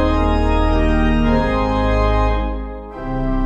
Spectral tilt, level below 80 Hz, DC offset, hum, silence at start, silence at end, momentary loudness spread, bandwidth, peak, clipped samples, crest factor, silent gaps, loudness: -8 dB/octave; -20 dBFS; under 0.1%; none; 0 s; 0 s; 10 LU; 8 kHz; -4 dBFS; under 0.1%; 12 dB; none; -18 LUFS